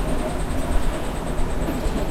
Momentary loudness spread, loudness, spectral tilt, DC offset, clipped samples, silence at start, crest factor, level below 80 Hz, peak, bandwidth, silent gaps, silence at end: 2 LU; -27 LUFS; -6 dB/octave; under 0.1%; under 0.1%; 0 s; 14 dB; -24 dBFS; -6 dBFS; 15 kHz; none; 0 s